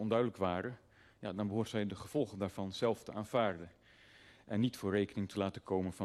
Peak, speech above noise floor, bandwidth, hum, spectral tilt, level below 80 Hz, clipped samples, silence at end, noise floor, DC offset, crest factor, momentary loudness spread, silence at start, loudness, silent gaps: -20 dBFS; 26 dB; 13 kHz; none; -6.5 dB/octave; -70 dBFS; under 0.1%; 0 s; -62 dBFS; under 0.1%; 18 dB; 10 LU; 0 s; -38 LUFS; none